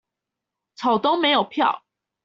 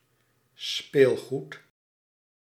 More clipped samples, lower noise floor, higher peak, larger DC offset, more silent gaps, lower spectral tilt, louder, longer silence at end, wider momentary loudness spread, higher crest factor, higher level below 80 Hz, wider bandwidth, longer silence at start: neither; first, -85 dBFS vs -69 dBFS; about the same, -8 dBFS vs -6 dBFS; neither; neither; second, -1 dB/octave vs -5 dB/octave; first, -21 LUFS vs -26 LUFS; second, 0.45 s vs 1 s; second, 7 LU vs 21 LU; second, 16 dB vs 22 dB; first, -68 dBFS vs -78 dBFS; second, 7.6 kHz vs 14.5 kHz; first, 0.8 s vs 0.6 s